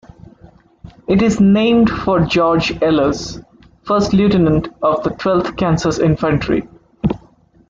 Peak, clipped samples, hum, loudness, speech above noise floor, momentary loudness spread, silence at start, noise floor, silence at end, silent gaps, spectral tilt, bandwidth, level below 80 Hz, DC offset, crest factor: -2 dBFS; under 0.1%; none; -15 LUFS; 35 dB; 10 LU; 0.85 s; -49 dBFS; 0.5 s; none; -6.5 dB/octave; 7.6 kHz; -38 dBFS; under 0.1%; 14 dB